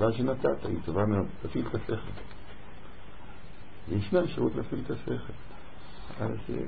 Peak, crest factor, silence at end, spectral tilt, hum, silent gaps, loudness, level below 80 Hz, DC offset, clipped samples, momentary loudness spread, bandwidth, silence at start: -12 dBFS; 20 dB; 0 s; -11.5 dB/octave; none; none; -31 LUFS; -50 dBFS; 2%; under 0.1%; 21 LU; 4.8 kHz; 0 s